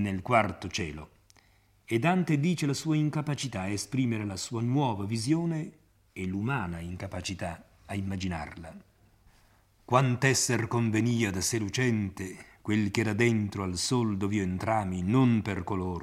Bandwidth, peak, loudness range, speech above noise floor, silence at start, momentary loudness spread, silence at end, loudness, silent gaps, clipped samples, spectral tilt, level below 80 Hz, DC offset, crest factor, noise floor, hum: 15.5 kHz; -8 dBFS; 8 LU; 35 dB; 0 s; 12 LU; 0 s; -29 LUFS; none; under 0.1%; -5 dB/octave; -60 dBFS; under 0.1%; 22 dB; -63 dBFS; none